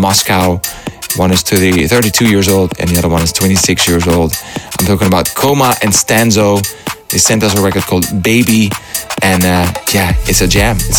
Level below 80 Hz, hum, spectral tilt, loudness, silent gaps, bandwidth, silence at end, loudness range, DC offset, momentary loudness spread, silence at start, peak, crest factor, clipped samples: -26 dBFS; none; -4 dB/octave; -11 LUFS; none; 19.5 kHz; 0 s; 1 LU; under 0.1%; 7 LU; 0 s; 0 dBFS; 10 dB; under 0.1%